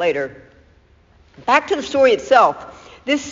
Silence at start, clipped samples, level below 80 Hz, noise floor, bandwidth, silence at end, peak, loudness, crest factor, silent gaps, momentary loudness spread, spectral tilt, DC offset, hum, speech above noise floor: 0 s; under 0.1%; -54 dBFS; -52 dBFS; 7.6 kHz; 0 s; 0 dBFS; -16 LUFS; 18 dB; none; 18 LU; -1.5 dB/octave; under 0.1%; none; 36 dB